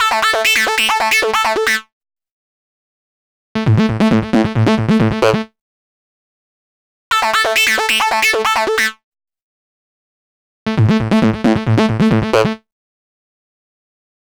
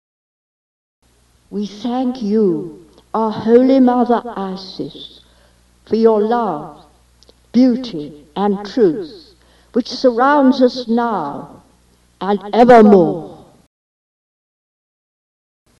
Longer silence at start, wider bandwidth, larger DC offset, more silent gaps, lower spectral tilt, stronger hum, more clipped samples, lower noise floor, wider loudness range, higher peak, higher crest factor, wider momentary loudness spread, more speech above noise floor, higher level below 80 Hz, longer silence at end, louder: second, 0 s vs 1.5 s; first, over 20 kHz vs 7.4 kHz; neither; first, 1.92-2.01 s, 2.31-3.55 s, 5.61-7.11 s, 9.03-9.12 s, 9.42-10.66 s vs none; second, -4.5 dB/octave vs -7 dB/octave; second, none vs 60 Hz at -55 dBFS; neither; first, under -90 dBFS vs -53 dBFS; second, 3 LU vs 6 LU; about the same, 0 dBFS vs 0 dBFS; about the same, 16 dB vs 16 dB; second, 7 LU vs 18 LU; first, over 76 dB vs 39 dB; first, -42 dBFS vs -54 dBFS; second, 1.65 s vs 2.45 s; about the same, -14 LUFS vs -14 LUFS